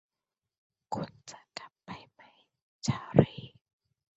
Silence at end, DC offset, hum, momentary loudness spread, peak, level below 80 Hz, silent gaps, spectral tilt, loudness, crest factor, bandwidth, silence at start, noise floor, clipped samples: 0.7 s; under 0.1%; none; 21 LU; -4 dBFS; -60 dBFS; 2.62-2.79 s; -7 dB/octave; -31 LUFS; 30 dB; 8 kHz; 0.9 s; under -90 dBFS; under 0.1%